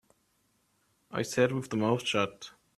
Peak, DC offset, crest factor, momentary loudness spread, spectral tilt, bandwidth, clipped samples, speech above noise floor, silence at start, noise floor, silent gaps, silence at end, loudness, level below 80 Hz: -12 dBFS; under 0.1%; 20 dB; 10 LU; -5 dB/octave; 14 kHz; under 0.1%; 43 dB; 1.1 s; -73 dBFS; none; 0.3 s; -30 LUFS; -70 dBFS